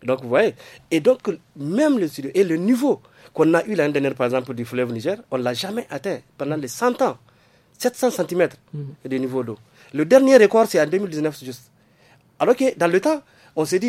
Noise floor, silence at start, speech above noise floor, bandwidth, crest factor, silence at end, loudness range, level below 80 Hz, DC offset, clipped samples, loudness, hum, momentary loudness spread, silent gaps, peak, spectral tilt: -56 dBFS; 0.05 s; 36 dB; 16 kHz; 20 dB; 0 s; 6 LU; -68 dBFS; under 0.1%; under 0.1%; -20 LUFS; none; 14 LU; none; 0 dBFS; -5.5 dB/octave